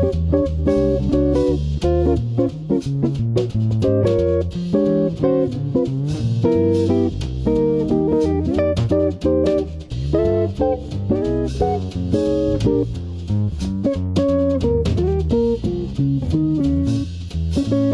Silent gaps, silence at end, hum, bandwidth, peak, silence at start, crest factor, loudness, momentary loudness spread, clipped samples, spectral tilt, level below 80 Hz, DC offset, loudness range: none; 0 s; none; 10.5 kHz; -4 dBFS; 0 s; 14 dB; -19 LUFS; 5 LU; under 0.1%; -9 dB/octave; -30 dBFS; under 0.1%; 2 LU